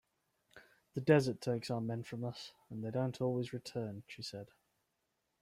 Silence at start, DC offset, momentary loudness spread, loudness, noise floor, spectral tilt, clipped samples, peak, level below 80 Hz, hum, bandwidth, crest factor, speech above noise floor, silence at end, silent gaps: 0.55 s; under 0.1%; 16 LU; -38 LUFS; -84 dBFS; -6.5 dB/octave; under 0.1%; -14 dBFS; -74 dBFS; none; 15 kHz; 24 dB; 47 dB; 0.95 s; none